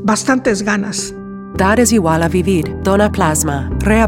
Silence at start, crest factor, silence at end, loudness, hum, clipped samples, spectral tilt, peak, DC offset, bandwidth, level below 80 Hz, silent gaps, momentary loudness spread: 0 s; 14 dB; 0 s; -14 LUFS; none; under 0.1%; -5 dB/octave; 0 dBFS; under 0.1%; 17 kHz; -30 dBFS; none; 9 LU